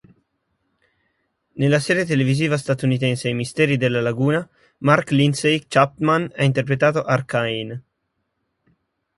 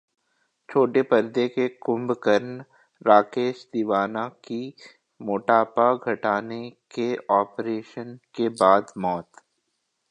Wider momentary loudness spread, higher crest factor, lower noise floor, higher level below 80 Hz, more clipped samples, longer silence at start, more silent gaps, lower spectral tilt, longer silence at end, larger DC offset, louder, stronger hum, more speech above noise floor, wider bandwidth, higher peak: second, 7 LU vs 17 LU; about the same, 20 dB vs 22 dB; about the same, -74 dBFS vs -76 dBFS; first, -58 dBFS vs -72 dBFS; neither; first, 1.55 s vs 0.7 s; neither; about the same, -6 dB/octave vs -6.5 dB/octave; first, 1.35 s vs 0.9 s; neither; first, -19 LUFS vs -23 LUFS; neither; about the same, 55 dB vs 53 dB; about the same, 11.5 kHz vs 11 kHz; about the same, 0 dBFS vs -2 dBFS